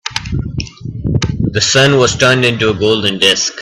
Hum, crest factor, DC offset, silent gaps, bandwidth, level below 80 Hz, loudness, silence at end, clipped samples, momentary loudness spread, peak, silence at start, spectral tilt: none; 14 dB; under 0.1%; none; 14 kHz; -32 dBFS; -12 LUFS; 0 s; under 0.1%; 13 LU; 0 dBFS; 0.05 s; -3.5 dB/octave